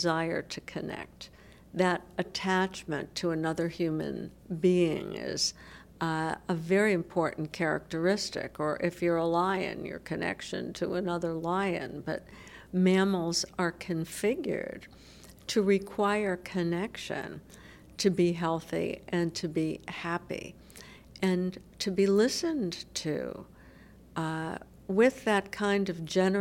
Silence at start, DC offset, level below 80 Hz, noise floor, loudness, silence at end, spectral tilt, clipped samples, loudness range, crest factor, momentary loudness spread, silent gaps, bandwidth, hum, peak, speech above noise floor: 0 s; under 0.1%; -60 dBFS; -54 dBFS; -31 LUFS; 0 s; -5 dB/octave; under 0.1%; 2 LU; 18 dB; 14 LU; none; 16.5 kHz; none; -12 dBFS; 23 dB